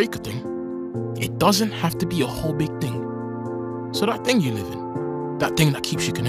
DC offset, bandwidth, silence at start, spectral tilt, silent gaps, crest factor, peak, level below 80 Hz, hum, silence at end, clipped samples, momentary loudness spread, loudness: under 0.1%; 15.5 kHz; 0 s; -5 dB/octave; none; 20 dB; -4 dBFS; -50 dBFS; none; 0 s; under 0.1%; 10 LU; -24 LUFS